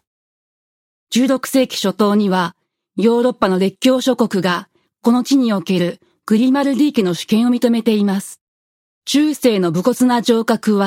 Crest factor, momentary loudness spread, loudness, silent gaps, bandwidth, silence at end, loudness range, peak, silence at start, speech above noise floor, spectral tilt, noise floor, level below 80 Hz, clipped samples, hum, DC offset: 14 dB; 6 LU; -16 LUFS; 8.41-9.02 s; 16.5 kHz; 0 s; 1 LU; -2 dBFS; 1.1 s; over 75 dB; -5.5 dB/octave; under -90 dBFS; -62 dBFS; under 0.1%; none; under 0.1%